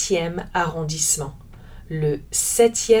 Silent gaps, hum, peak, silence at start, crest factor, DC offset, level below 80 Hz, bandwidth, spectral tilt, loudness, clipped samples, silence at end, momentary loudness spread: none; none; -4 dBFS; 0 s; 18 dB; under 0.1%; -42 dBFS; 20 kHz; -3.5 dB/octave; -21 LUFS; under 0.1%; 0 s; 8 LU